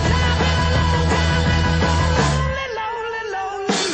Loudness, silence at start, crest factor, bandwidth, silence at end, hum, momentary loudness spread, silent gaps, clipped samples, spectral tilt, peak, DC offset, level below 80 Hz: -19 LUFS; 0 s; 16 dB; 9.2 kHz; 0 s; none; 7 LU; none; under 0.1%; -5 dB/octave; -2 dBFS; under 0.1%; -26 dBFS